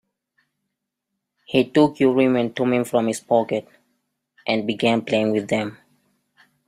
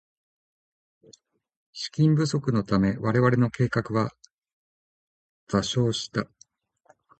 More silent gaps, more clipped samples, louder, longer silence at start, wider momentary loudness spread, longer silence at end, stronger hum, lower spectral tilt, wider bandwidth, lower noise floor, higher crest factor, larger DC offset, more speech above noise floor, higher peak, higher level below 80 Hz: second, none vs 4.32-4.37 s, 4.53-5.47 s; neither; first, -21 LUFS vs -25 LUFS; second, 1.5 s vs 1.75 s; second, 8 LU vs 11 LU; about the same, 0.95 s vs 0.95 s; neither; about the same, -5.5 dB/octave vs -6.5 dB/octave; first, 14.5 kHz vs 9 kHz; first, -80 dBFS vs -62 dBFS; about the same, 18 dB vs 20 dB; neither; first, 61 dB vs 39 dB; about the same, -4 dBFS vs -6 dBFS; second, -64 dBFS vs -54 dBFS